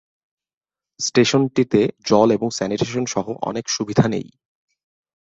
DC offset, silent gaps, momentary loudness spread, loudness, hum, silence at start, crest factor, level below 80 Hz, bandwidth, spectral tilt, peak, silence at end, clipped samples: under 0.1%; none; 9 LU; -19 LUFS; none; 1 s; 20 dB; -56 dBFS; 8 kHz; -5 dB/octave; -2 dBFS; 0.95 s; under 0.1%